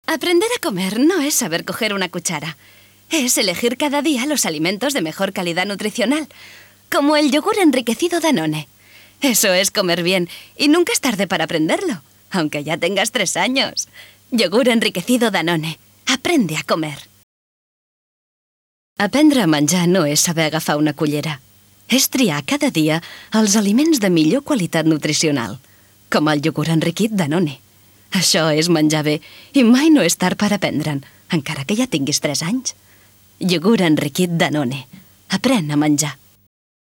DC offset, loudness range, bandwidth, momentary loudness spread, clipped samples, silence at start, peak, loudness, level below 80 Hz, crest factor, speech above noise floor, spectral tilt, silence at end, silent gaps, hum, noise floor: under 0.1%; 3 LU; 18.5 kHz; 9 LU; under 0.1%; 0.1 s; 0 dBFS; -17 LUFS; -62 dBFS; 18 dB; 33 dB; -4 dB/octave; 0.7 s; 17.23-18.96 s; none; -50 dBFS